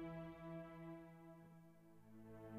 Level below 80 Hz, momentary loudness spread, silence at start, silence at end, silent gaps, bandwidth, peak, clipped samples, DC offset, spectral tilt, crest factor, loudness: -74 dBFS; 12 LU; 0 s; 0 s; none; 15 kHz; -42 dBFS; under 0.1%; under 0.1%; -8 dB/octave; 14 dB; -57 LUFS